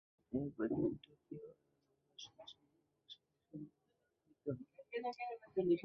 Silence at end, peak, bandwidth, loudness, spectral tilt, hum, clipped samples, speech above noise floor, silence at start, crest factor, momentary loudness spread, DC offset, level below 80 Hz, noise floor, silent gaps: 0 s; -24 dBFS; 6.2 kHz; -44 LUFS; -6 dB/octave; none; under 0.1%; 43 dB; 0.3 s; 20 dB; 20 LU; under 0.1%; -74 dBFS; -83 dBFS; none